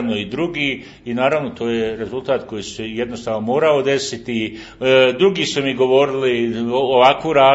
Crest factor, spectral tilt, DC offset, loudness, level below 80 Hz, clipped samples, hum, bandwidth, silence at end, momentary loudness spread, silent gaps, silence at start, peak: 18 dB; -4.5 dB/octave; under 0.1%; -18 LUFS; -52 dBFS; under 0.1%; none; 8 kHz; 0 s; 11 LU; none; 0 s; 0 dBFS